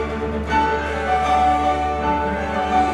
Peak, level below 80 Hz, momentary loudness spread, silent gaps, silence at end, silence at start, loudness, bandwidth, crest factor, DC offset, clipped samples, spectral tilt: -6 dBFS; -32 dBFS; 5 LU; none; 0 s; 0 s; -20 LUFS; 11.5 kHz; 14 dB; under 0.1%; under 0.1%; -6 dB/octave